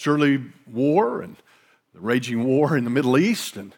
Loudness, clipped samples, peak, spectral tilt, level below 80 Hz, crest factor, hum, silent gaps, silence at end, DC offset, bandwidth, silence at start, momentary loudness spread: -21 LUFS; under 0.1%; -6 dBFS; -6 dB/octave; -80 dBFS; 16 dB; none; none; 0.1 s; under 0.1%; 18.5 kHz; 0 s; 13 LU